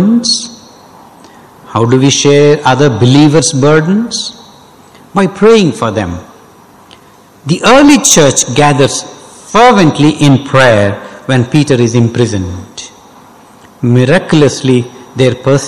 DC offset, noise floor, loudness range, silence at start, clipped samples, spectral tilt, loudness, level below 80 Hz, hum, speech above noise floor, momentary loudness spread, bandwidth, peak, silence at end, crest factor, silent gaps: under 0.1%; -40 dBFS; 5 LU; 0 s; 0.1%; -5 dB/octave; -8 LUFS; -40 dBFS; none; 32 dB; 15 LU; 20 kHz; 0 dBFS; 0 s; 10 dB; none